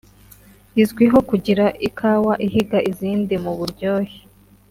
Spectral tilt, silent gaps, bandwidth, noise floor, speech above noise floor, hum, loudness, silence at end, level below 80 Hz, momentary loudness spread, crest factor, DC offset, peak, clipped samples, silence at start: -7 dB/octave; none; 16 kHz; -47 dBFS; 30 dB; none; -19 LUFS; 0.5 s; -48 dBFS; 9 LU; 16 dB; under 0.1%; -2 dBFS; under 0.1%; 0.75 s